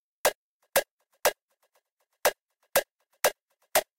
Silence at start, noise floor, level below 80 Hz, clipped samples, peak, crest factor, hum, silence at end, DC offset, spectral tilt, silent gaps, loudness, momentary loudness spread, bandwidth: 0.25 s; -74 dBFS; -64 dBFS; under 0.1%; -10 dBFS; 22 dB; none; 0.15 s; under 0.1%; 0 dB/octave; 0.35-0.60 s, 0.91-0.98 s, 1.42-1.48 s, 1.92-1.97 s, 2.42-2.49 s, 2.91-2.99 s, 3.42-3.46 s; -29 LUFS; 1 LU; 16.5 kHz